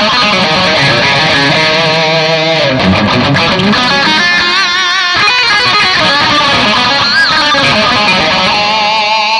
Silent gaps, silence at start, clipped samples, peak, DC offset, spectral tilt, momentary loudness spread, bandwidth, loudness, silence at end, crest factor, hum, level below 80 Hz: none; 0 s; under 0.1%; 0 dBFS; under 0.1%; -3.5 dB/octave; 2 LU; 11.5 kHz; -7 LUFS; 0 s; 8 dB; none; -40 dBFS